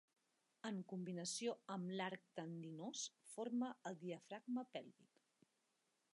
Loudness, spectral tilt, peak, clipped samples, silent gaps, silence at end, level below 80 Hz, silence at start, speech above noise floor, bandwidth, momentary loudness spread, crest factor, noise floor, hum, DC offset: -49 LUFS; -4.5 dB/octave; -32 dBFS; under 0.1%; none; 1.1 s; under -90 dBFS; 0.65 s; 37 dB; 11.5 kHz; 8 LU; 16 dB; -86 dBFS; none; under 0.1%